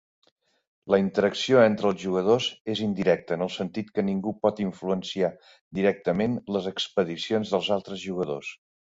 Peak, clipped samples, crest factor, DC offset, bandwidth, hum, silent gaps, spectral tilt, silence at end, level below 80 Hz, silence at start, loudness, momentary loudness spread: -6 dBFS; under 0.1%; 20 dB; under 0.1%; 7.8 kHz; none; 2.60-2.65 s, 5.61-5.71 s; -5.5 dB/octave; 0.3 s; -62 dBFS; 0.85 s; -26 LUFS; 9 LU